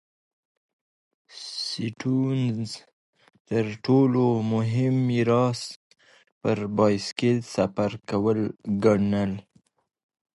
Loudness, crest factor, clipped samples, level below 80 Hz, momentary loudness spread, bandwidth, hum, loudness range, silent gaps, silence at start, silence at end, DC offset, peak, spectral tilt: -25 LUFS; 18 dB; under 0.1%; -58 dBFS; 11 LU; 11.5 kHz; none; 6 LU; 2.93-3.13 s, 3.40-3.45 s, 5.76-5.90 s, 6.32-6.41 s; 1.35 s; 0.95 s; under 0.1%; -6 dBFS; -7 dB/octave